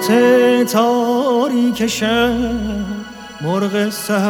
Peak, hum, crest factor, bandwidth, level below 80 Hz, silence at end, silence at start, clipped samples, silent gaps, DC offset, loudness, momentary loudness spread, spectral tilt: 0 dBFS; none; 14 dB; 20 kHz; -40 dBFS; 0 s; 0 s; under 0.1%; none; under 0.1%; -16 LUFS; 12 LU; -5 dB/octave